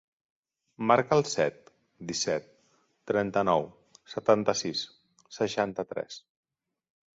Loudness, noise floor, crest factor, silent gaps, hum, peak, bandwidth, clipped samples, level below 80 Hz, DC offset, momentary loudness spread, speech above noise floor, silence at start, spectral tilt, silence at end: -28 LUFS; -69 dBFS; 24 dB; none; none; -6 dBFS; 8 kHz; under 0.1%; -68 dBFS; under 0.1%; 16 LU; 41 dB; 0.8 s; -4 dB/octave; 1 s